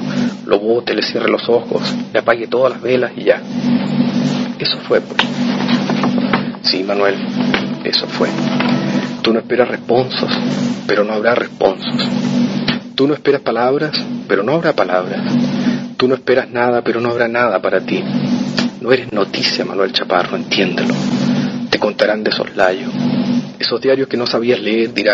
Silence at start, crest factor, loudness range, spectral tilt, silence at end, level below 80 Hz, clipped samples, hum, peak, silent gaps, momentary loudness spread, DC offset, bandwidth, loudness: 0 s; 16 dB; 1 LU; -5.5 dB/octave; 0 s; -56 dBFS; under 0.1%; none; 0 dBFS; none; 3 LU; under 0.1%; 7.8 kHz; -16 LUFS